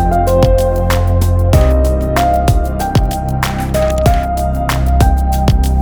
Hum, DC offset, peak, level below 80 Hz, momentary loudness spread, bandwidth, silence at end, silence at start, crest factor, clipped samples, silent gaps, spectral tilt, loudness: none; under 0.1%; 0 dBFS; -14 dBFS; 5 LU; over 20 kHz; 0 s; 0 s; 12 dB; under 0.1%; none; -6.5 dB/octave; -13 LUFS